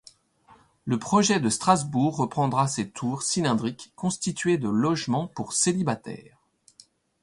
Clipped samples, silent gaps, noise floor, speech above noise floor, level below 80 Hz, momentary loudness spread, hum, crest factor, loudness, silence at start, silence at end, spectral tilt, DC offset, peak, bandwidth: under 0.1%; none; -58 dBFS; 33 dB; -62 dBFS; 9 LU; none; 20 dB; -25 LUFS; 0.85 s; 1 s; -4.5 dB/octave; under 0.1%; -6 dBFS; 11.5 kHz